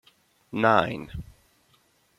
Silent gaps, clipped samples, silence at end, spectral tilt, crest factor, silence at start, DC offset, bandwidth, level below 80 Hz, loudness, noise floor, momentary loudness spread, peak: none; under 0.1%; 0.95 s; -6.5 dB/octave; 24 dB; 0.55 s; under 0.1%; 14.5 kHz; -52 dBFS; -24 LUFS; -65 dBFS; 19 LU; -4 dBFS